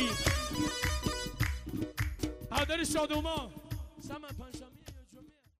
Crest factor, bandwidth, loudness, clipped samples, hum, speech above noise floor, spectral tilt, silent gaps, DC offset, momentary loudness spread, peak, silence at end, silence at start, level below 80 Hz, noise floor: 20 dB; 16 kHz; -35 LUFS; under 0.1%; none; 24 dB; -4 dB/octave; none; under 0.1%; 17 LU; -16 dBFS; 0.3 s; 0 s; -44 dBFS; -58 dBFS